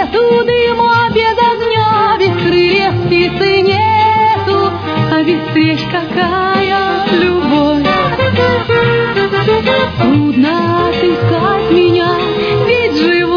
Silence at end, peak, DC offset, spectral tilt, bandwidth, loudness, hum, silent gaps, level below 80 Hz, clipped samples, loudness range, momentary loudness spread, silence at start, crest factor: 0 s; 0 dBFS; under 0.1%; -7.5 dB/octave; 5.4 kHz; -11 LUFS; none; none; -38 dBFS; under 0.1%; 1 LU; 3 LU; 0 s; 10 dB